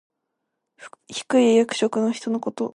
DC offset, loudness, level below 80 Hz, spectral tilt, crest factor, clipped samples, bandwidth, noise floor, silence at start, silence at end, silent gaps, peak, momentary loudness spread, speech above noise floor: under 0.1%; -21 LUFS; -74 dBFS; -4.5 dB/octave; 16 dB; under 0.1%; 11 kHz; -79 dBFS; 0.8 s; 0.05 s; none; -6 dBFS; 13 LU; 58 dB